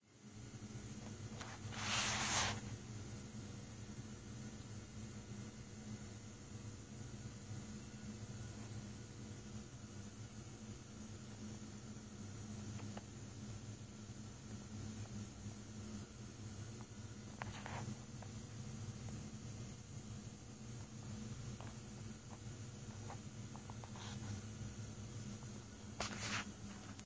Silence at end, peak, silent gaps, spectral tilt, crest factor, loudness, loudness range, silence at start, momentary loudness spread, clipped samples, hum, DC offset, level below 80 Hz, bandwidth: 0 s; -26 dBFS; none; -3.5 dB/octave; 24 dB; -49 LUFS; 10 LU; 0 s; 8 LU; under 0.1%; none; under 0.1%; -62 dBFS; 8 kHz